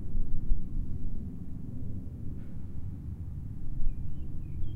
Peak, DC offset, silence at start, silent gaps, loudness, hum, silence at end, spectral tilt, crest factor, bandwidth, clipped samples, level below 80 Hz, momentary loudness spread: -12 dBFS; under 0.1%; 0 s; none; -40 LUFS; none; 0 s; -10 dB/octave; 16 dB; 0.9 kHz; under 0.1%; -32 dBFS; 5 LU